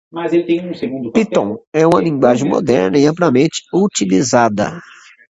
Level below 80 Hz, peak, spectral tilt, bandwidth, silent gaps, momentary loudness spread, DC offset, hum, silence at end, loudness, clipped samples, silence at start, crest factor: -52 dBFS; 0 dBFS; -5.5 dB/octave; 11 kHz; 1.67-1.72 s; 7 LU; under 0.1%; none; 0.6 s; -15 LUFS; under 0.1%; 0.15 s; 14 dB